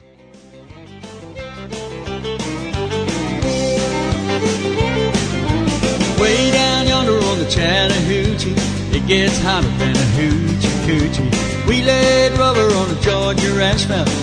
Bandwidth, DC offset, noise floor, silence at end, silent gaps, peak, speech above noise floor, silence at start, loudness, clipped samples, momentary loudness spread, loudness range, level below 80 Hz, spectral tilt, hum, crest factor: 10.5 kHz; under 0.1%; -44 dBFS; 0 s; none; -2 dBFS; 29 dB; 0.55 s; -16 LUFS; under 0.1%; 11 LU; 6 LU; -30 dBFS; -4.5 dB/octave; none; 14 dB